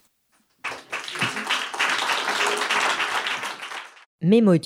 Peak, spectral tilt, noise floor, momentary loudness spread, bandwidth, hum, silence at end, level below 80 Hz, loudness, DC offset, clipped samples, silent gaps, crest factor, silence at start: -8 dBFS; -4 dB/octave; -66 dBFS; 13 LU; 16.5 kHz; none; 0 s; -74 dBFS; -23 LUFS; under 0.1%; under 0.1%; 4.06-4.19 s; 16 dB; 0.65 s